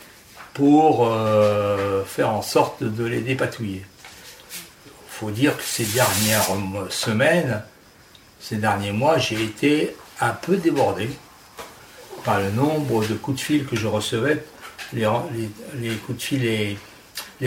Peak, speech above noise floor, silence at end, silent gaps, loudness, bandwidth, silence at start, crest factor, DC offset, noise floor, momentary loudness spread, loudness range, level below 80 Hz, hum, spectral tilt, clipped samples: -4 dBFS; 28 dB; 0 s; none; -22 LUFS; 19 kHz; 0 s; 18 dB; under 0.1%; -50 dBFS; 18 LU; 5 LU; -56 dBFS; none; -5 dB/octave; under 0.1%